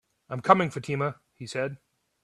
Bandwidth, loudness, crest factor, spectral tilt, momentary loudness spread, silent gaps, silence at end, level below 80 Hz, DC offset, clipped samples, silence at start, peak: 12 kHz; -27 LUFS; 26 dB; -6 dB/octave; 15 LU; none; 0.45 s; -68 dBFS; under 0.1%; under 0.1%; 0.3 s; -2 dBFS